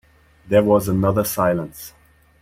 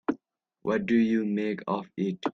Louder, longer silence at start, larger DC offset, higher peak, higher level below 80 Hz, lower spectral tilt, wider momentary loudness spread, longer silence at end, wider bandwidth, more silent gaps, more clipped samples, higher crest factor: first, -19 LUFS vs -28 LUFS; first, 0.45 s vs 0.1 s; neither; first, -4 dBFS vs -14 dBFS; first, -46 dBFS vs -68 dBFS; about the same, -6.5 dB/octave vs -7.5 dB/octave; first, 19 LU vs 10 LU; first, 0.5 s vs 0.05 s; first, 16 kHz vs 6.8 kHz; neither; neither; about the same, 16 dB vs 14 dB